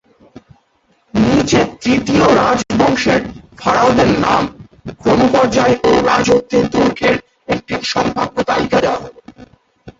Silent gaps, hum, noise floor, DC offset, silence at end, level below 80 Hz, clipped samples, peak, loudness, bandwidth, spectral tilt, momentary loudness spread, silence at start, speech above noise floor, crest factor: none; none; -58 dBFS; under 0.1%; 0.1 s; -40 dBFS; under 0.1%; 0 dBFS; -14 LUFS; 8 kHz; -5 dB/octave; 10 LU; 1.15 s; 45 dB; 14 dB